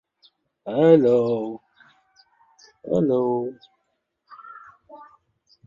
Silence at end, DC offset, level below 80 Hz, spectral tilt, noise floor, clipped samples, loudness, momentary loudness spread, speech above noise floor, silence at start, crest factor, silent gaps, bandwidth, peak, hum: 0.65 s; under 0.1%; -66 dBFS; -9 dB/octave; -75 dBFS; under 0.1%; -21 LUFS; 27 LU; 55 dB; 0.65 s; 20 dB; none; 7.2 kHz; -4 dBFS; none